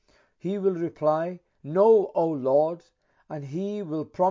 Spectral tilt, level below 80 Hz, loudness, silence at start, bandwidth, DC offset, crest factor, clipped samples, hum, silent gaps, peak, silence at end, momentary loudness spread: -9 dB/octave; -74 dBFS; -25 LUFS; 0.45 s; 7.4 kHz; under 0.1%; 16 dB; under 0.1%; none; none; -10 dBFS; 0 s; 17 LU